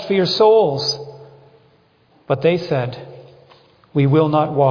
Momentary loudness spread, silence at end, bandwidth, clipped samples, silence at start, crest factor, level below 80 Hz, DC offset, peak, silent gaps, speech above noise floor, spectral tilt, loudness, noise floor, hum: 14 LU; 0 s; 5.4 kHz; under 0.1%; 0 s; 16 dB; -58 dBFS; under 0.1%; -2 dBFS; none; 40 dB; -6.5 dB/octave; -17 LUFS; -55 dBFS; none